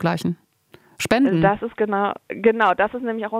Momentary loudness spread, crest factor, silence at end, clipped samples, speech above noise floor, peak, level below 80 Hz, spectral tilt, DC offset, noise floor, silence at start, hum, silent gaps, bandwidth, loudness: 10 LU; 18 dB; 0 s; under 0.1%; 33 dB; -2 dBFS; -54 dBFS; -6 dB/octave; under 0.1%; -53 dBFS; 0 s; none; none; 16 kHz; -20 LUFS